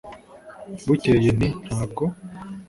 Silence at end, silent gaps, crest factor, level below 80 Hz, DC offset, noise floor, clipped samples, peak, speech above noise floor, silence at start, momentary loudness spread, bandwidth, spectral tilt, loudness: 0.05 s; none; 16 dB; -44 dBFS; under 0.1%; -43 dBFS; under 0.1%; -6 dBFS; 22 dB; 0.05 s; 23 LU; 11.5 kHz; -7.5 dB/octave; -22 LUFS